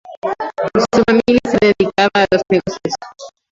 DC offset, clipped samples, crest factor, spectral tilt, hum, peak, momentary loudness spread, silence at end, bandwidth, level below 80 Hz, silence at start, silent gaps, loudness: under 0.1%; under 0.1%; 14 dB; -5 dB/octave; none; 0 dBFS; 11 LU; 0.25 s; 7.8 kHz; -46 dBFS; 0.05 s; 0.17-0.22 s; -15 LUFS